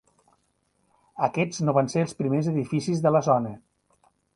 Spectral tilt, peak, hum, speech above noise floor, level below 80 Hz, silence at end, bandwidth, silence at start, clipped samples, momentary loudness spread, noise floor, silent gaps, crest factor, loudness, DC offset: -7 dB/octave; -8 dBFS; none; 47 dB; -64 dBFS; 0.75 s; 11 kHz; 1.15 s; under 0.1%; 6 LU; -71 dBFS; none; 20 dB; -25 LUFS; under 0.1%